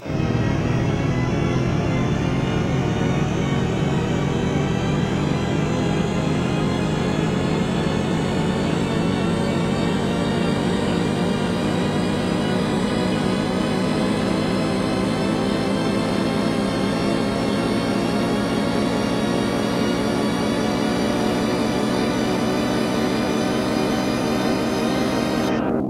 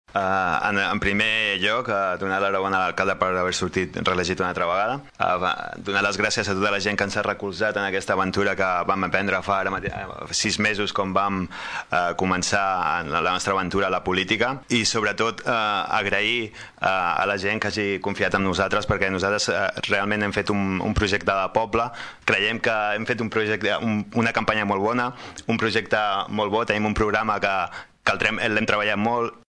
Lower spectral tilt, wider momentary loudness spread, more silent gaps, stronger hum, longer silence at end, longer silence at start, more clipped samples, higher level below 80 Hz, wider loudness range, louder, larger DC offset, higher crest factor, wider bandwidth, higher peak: first, -6 dB/octave vs -4 dB/octave; second, 1 LU vs 5 LU; neither; neither; second, 0 s vs 0.15 s; about the same, 0 s vs 0.1 s; neither; first, -38 dBFS vs -46 dBFS; about the same, 0 LU vs 1 LU; about the same, -21 LUFS vs -23 LUFS; neither; second, 12 dB vs 18 dB; first, 15 kHz vs 10.5 kHz; second, -8 dBFS vs -4 dBFS